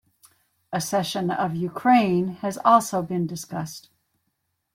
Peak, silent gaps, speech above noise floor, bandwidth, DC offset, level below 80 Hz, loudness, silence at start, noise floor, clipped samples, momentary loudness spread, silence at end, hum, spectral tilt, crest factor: -4 dBFS; none; 53 dB; 16.5 kHz; under 0.1%; -66 dBFS; -23 LUFS; 0.7 s; -76 dBFS; under 0.1%; 14 LU; 0.95 s; none; -5.5 dB/octave; 20 dB